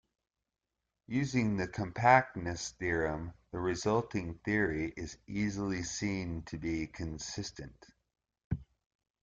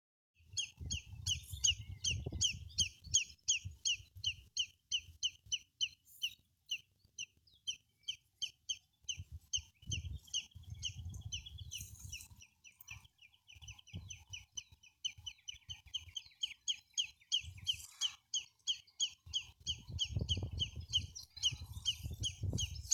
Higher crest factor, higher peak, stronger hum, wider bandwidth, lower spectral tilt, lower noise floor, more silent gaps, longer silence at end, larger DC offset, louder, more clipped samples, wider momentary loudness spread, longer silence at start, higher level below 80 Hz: about the same, 24 dB vs 24 dB; first, -10 dBFS vs -18 dBFS; neither; second, 9.4 kHz vs 19 kHz; first, -5.5 dB/octave vs -0.5 dB/octave; first, -87 dBFS vs -66 dBFS; first, 8.44-8.50 s vs none; first, 0.6 s vs 0 s; neither; first, -34 LUFS vs -40 LUFS; neither; about the same, 12 LU vs 14 LU; first, 1.1 s vs 0.5 s; about the same, -56 dBFS vs -56 dBFS